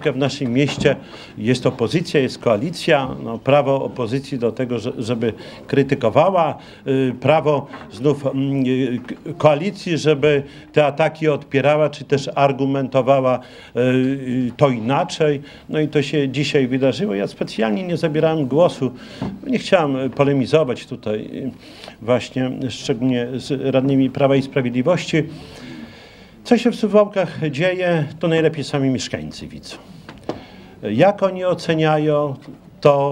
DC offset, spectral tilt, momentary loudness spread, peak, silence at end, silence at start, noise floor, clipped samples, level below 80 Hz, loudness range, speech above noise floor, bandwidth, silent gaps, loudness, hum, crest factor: under 0.1%; -6.5 dB/octave; 13 LU; 0 dBFS; 0 s; 0 s; -43 dBFS; under 0.1%; -54 dBFS; 3 LU; 24 dB; 11.5 kHz; none; -19 LUFS; none; 18 dB